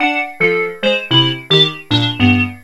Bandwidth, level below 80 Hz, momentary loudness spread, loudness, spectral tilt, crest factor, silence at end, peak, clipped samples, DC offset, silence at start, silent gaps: 12 kHz; -44 dBFS; 5 LU; -13 LUFS; -5.5 dB/octave; 14 dB; 0.05 s; 0 dBFS; under 0.1%; 0.8%; 0 s; none